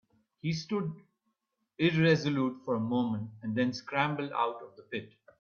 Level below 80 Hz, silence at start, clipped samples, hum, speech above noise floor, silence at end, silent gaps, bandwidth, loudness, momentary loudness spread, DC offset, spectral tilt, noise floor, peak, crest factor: -70 dBFS; 0.45 s; under 0.1%; none; 51 dB; 0.35 s; none; 7 kHz; -31 LUFS; 14 LU; under 0.1%; -6.5 dB/octave; -81 dBFS; -12 dBFS; 20 dB